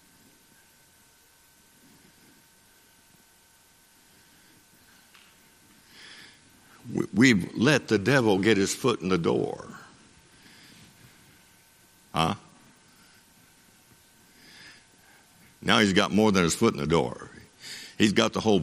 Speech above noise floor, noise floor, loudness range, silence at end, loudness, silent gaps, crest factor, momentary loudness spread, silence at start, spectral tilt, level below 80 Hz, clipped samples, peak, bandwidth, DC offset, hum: 36 dB; -59 dBFS; 12 LU; 0 s; -24 LUFS; none; 26 dB; 26 LU; 6.1 s; -4.5 dB/octave; -58 dBFS; under 0.1%; -2 dBFS; 14.5 kHz; under 0.1%; none